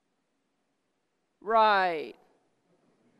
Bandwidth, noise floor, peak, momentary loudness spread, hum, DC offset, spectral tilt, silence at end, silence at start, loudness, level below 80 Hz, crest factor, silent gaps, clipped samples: 11.5 kHz; -78 dBFS; -12 dBFS; 21 LU; none; under 0.1%; -5 dB/octave; 1.1 s; 1.45 s; -25 LUFS; -74 dBFS; 20 dB; none; under 0.1%